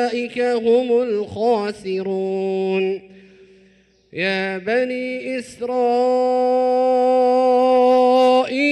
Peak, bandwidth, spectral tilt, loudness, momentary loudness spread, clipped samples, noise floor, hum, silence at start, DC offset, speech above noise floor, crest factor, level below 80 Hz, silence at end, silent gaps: -6 dBFS; 10.5 kHz; -5.5 dB/octave; -18 LUFS; 11 LU; under 0.1%; -55 dBFS; none; 0 s; under 0.1%; 37 dB; 12 dB; -64 dBFS; 0 s; none